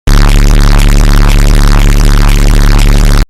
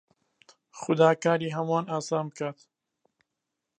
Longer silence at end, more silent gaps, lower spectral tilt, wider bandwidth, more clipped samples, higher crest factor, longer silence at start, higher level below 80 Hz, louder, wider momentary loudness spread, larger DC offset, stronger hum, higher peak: second, 0.05 s vs 1.25 s; neither; about the same, -5 dB/octave vs -6 dB/octave; first, 14.5 kHz vs 9.8 kHz; first, 0.2% vs under 0.1%; second, 4 dB vs 22 dB; second, 0.05 s vs 0.75 s; first, -4 dBFS vs -78 dBFS; first, -8 LUFS vs -27 LUFS; second, 1 LU vs 14 LU; neither; neither; first, 0 dBFS vs -8 dBFS